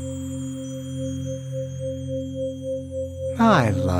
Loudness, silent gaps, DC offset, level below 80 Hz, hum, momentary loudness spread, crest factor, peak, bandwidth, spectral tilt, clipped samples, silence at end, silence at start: -25 LUFS; none; under 0.1%; -48 dBFS; none; 13 LU; 22 dB; -2 dBFS; 15.5 kHz; -6.5 dB/octave; under 0.1%; 0 s; 0 s